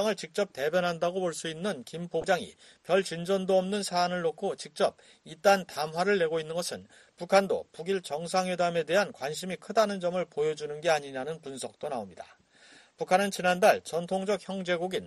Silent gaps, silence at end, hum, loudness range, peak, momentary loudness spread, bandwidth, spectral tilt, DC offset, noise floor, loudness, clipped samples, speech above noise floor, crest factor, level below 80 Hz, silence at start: none; 0 s; none; 3 LU; -8 dBFS; 12 LU; 13 kHz; -4 dB/octave; under 0.1%; -57 dBFS; -29 LUFS; under 0.1%; 28 dB; 22 dB; -70 dBFS; 0 s